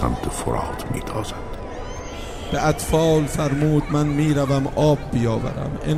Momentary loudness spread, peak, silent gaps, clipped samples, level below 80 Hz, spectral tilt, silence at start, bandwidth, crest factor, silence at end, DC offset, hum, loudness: 14 LU; -4 dBFS; none; under 0.1%; -34 dBFS; -6.5 dB/octave; 0 s; 15 kHz; 16 dB; 0 s; 0.4%; none; -21 LUFS